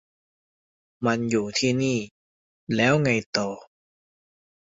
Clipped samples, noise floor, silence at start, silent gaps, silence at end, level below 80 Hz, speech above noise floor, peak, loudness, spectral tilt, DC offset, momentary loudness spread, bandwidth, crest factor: under 0.1%; under -90 dBFS; 1 s; 2.11-2.67 s, 3.26-3.33 s; 1.05 s; -62 dBFS; over 67 dB; -6 dBFS; -24 LUFS; -5 dB/octave; under 0.1%; 11 LU; 7.8 kHz; 20 dB